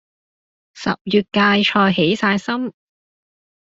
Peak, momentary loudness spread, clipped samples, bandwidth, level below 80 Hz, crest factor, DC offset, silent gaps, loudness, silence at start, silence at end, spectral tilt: -2 dBFS; 10 LU; under 0.1%; 7.8 kHz; -58 dBFS; 18 dB; under 0.1%; 1.01-1.05 s; -17 LUFS; 0.75 s; 1 s; -5.5 dB/octave